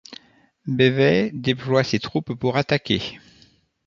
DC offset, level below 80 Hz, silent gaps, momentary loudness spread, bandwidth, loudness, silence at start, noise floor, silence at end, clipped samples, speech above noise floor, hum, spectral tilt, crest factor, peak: under 0.1%; -54 dBFS; none; 12 LU; 7.4 kHz; -21 LUFS; 0.1 s; -57 dBFS; 0.7 s; under 0.1%; 36 dB; none; -6.5 dB/octave; 20 dB; -2 dBFS